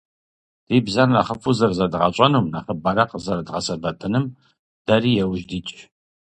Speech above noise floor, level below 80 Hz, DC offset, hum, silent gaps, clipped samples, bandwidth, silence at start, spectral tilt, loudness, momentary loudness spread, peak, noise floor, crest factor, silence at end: over 70 dB; -50 dBFS; under 0.1%; none; 4.59-4.85 s; under 0.1%; 9.4 kHz; 0.7 s; -6 dB/octave; -20 LUFS; 11 LU; 0 dBFS; under -90 dBFS; 20 dB; 0.4 s